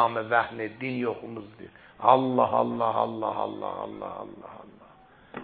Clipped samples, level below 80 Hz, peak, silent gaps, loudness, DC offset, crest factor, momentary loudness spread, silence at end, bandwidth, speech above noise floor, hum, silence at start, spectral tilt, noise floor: under 0.1%; -66 dBFS; -4 dBFS; none; -27 LUFS; under 0.1%; 24 dB; 24 LU; 0 s; 4.7 kHz; 27 dB; none; 0 s; -10 dB/octave; -54 dBFS